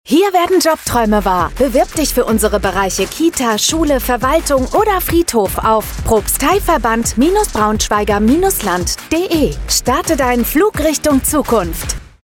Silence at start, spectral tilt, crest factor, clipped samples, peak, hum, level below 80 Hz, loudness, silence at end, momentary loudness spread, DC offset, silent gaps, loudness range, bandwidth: 0.05 s; -4 dB/octave; 12 dB; under 0.1%; -2 dBFS; none; -26 dBFS; -14 LUFS; 0.2 s; 4 LU; under 0.1%; none; 1 LU; 18 kHz